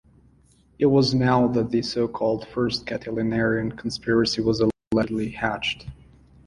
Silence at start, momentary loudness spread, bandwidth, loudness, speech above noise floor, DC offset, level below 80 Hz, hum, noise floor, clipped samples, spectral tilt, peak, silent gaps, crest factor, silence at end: 0.8 s; 9 LU; 11.5 kHz; -23 LUFS; 35 dB; under 0.1%; -50 dBFS; none; -58 dBFS; under 0.1%; -6 dB/octave; -6 dBFS; 4.87-4.91 s; 18 dB; 0.5 s